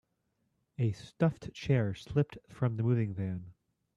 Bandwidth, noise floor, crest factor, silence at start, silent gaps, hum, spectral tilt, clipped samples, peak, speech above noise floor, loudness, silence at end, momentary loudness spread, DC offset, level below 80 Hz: 8 kHz; -79 dBFS; 18 dB; 0.8 s; none; none; -8.5 dB/octave; under 0.1%; -16 dBFS; 47 dB; -33 LUFS; 0.45 s; 8 LU; under 0.1%; -62 dBFS